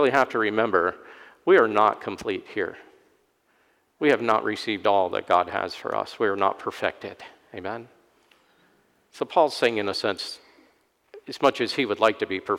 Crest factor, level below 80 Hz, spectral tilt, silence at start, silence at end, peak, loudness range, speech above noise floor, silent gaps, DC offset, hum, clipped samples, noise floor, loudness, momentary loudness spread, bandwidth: 20 dB; -68 dBFS; -4.5 dB/octave; 0 s; 0 s; -6 dBFS; 6 LU; 42 dB; none; under 0.1%; none; under 0.1%; -66 dBFS; -24 LUFS; 15 LU; 15.5 kHz